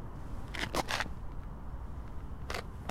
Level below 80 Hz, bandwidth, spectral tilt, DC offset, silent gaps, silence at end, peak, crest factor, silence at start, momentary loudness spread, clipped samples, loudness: -44 dBFS; 16.5 kHz; -4 dB/octave; under 0.1%; none; 0 s; -14 dBFS; 24 dB; 0 s; 12 LU; under 0.1%; -40 LUFS